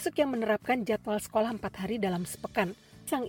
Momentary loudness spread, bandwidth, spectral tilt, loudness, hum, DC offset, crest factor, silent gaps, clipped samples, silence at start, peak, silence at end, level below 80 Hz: 6 LU; 17 kHz; -5 dB/octave; -31 LUFS; none; under 0.1%; 18 dB; none; under 0.1%; 0 s; -12 dBFS; 0 s; -60 dBFS